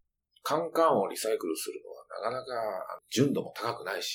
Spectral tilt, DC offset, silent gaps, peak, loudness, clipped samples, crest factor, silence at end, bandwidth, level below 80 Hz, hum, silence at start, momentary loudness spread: -4.5 dB/octave; under 0.1%; none; -12 dBFS; -31 LUFS; under 0.1%; 18 dB; 0 s; 19 kHz; -78 dBFS; none; 0.45 s; 13 LU